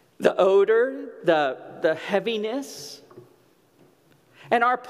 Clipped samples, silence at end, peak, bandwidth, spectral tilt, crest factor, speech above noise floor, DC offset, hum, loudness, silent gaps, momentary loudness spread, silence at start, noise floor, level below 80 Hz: under 0.1%; 0 s; -4 dBFS; 14.5 kHz; -4.5 dB/octave; 20 dB; 37 dB; under 0.1%; none; -23 LUFS; none; 17 LU; 0.2 s; -59 dBFS; -78 dBFS